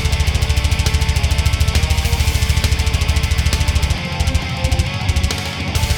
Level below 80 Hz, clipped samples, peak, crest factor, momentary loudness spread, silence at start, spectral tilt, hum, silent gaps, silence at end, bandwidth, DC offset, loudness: -20 dBFS; under 0.1%; 0 dBFS; 16 dB; 3 LU; 0 s; -4 dB/octave; none; none; 0 s; 20 kHz; under 0.1%; -17 LUFS